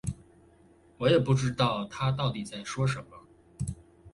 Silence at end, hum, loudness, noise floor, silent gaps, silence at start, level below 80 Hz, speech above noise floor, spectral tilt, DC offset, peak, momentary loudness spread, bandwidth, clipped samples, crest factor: 0.05 s; none; -29 LUFS; -59 dBFS; none; 0.05 s; -52 dBFS; 31 dB; -6 dB/octave; under 0.1%; -12 dBFS; 14 LU; 11.5 kHz; under 0.1%; 20 dB